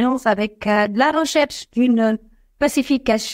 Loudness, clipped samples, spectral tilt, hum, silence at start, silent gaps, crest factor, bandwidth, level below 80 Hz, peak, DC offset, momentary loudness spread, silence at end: -19 LUFS; under 0.1%; -4 dB/octave; none; 0 s; none; 14 dB; 16 kHz; -50 dBFS; -4 dBFS; under 0.1%; 5 LU; 0 s